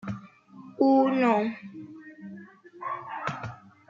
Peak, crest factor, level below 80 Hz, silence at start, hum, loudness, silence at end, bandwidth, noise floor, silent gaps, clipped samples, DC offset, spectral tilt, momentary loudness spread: -10 dBFS; 20 dB; -68 dBFS; 0.05 s; none; -26 LUFS; 0.35 s; 7.4 kHz; -49 dBFS; none; under 0.1%; under 0.1%; -7.5 dB/octave; 23 LU